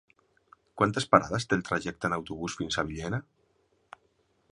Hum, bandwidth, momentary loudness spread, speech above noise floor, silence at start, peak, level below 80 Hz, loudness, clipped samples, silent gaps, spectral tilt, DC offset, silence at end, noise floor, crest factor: none; 11.5 kHz; 11 LU; 42 dB; 0.75 s; -4 dBFS; -56 dBFS; -29 LUFS; under 0.1%; none; -5 dB/octave; under 0.1%; 1.3 s; -71 dBFS; 28 dB